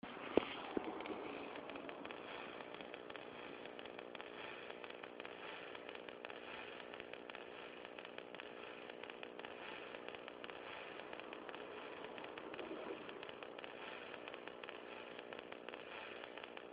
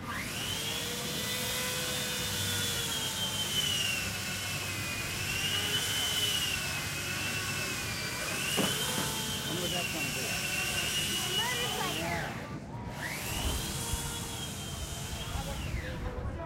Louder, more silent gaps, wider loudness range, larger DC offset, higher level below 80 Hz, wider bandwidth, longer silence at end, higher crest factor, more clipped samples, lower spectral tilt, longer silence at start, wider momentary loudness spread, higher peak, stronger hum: second, -50 LUFS vs -32 LUFS; neither; about the same, 3 LU vs 5 LU; neither; second, -80 dBFS vs -48 dBFS; second, 5 kHz vs 16 kHz; about the same, 0 s vs 0 s; first, 34 dB vs 18 dB; neither; about the same, -1.5 dB/octave vs -2 dB/octave; about the same, 0.05 s vs 0 s; second, 5 LU vs 9 LU; about the same, -16 dBFS vs -16 dBFS; neither